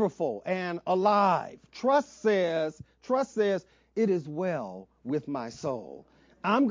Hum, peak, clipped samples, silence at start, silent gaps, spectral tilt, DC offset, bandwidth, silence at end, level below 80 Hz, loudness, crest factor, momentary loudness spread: none; -10 dBFS; under 0.1%; 0 s; none; -6.5 dB/octave; under 0.1%; 7.6 kHz; 0 s; -68 dBFS; -29 LUFS; 18 dB; 13 LU